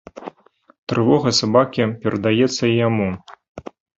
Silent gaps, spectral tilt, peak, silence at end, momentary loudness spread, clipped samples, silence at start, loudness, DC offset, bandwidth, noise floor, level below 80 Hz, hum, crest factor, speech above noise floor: 0.78-0.87 s, 3.49-3.55 s; -5.5 dB/octave; -2 dBFS; 0.35 s; 22 LU; under 0.1%; 0.15 s; -18 LUFS; under 0.1%; 8 kHz; -55 dBFS; -52 dBFS; none; 18 dB; 38 dB